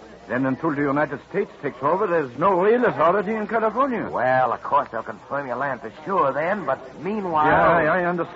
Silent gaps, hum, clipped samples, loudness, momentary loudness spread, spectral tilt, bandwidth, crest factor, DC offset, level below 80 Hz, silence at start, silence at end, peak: none; none; under 0.1%; -22 LUFS; 10 LU; -8 dB/octave; 7.8 kHz; 14 dB; under 0.1%; -54 dBFS; 0 s; 0 s; -6 dBFS